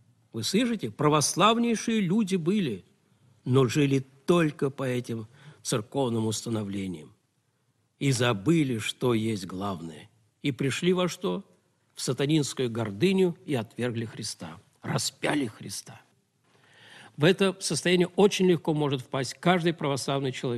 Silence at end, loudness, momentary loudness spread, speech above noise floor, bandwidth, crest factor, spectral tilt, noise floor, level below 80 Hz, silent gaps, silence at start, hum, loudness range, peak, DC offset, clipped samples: 0 s; -27 LUFS; 14 LU; 46 dB; 13.5 kHz; 20 dB; -5 dB/octave; -72 dBFS; -66 dBFS; none; 0.35 s; none; 6 LU; -8 dBFS; under 0.1%; under 0.1%